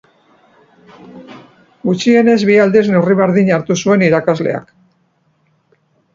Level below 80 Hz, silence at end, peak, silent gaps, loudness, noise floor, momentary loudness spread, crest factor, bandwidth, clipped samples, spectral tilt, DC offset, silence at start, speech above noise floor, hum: -56 dBFS; 1.55 s; 0 dBFS; none; -12 LUFS; -59 dBFS; 9 LU; 14 dB; 7.6 kHz; under 0.1%; -6.5 dB/octave; under 0.1%; 1.15 s; 47 dB; none